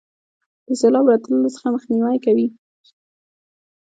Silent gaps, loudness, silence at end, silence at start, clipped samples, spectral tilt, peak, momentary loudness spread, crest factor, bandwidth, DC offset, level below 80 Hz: none; -18 LUFS; 1.45 s; 0.7 s; under 0.1%; -6 dB/octave; -2 dBFS; 9 LU; 18 dB; 9.2 kHz; under 0.1%; -70 dBFS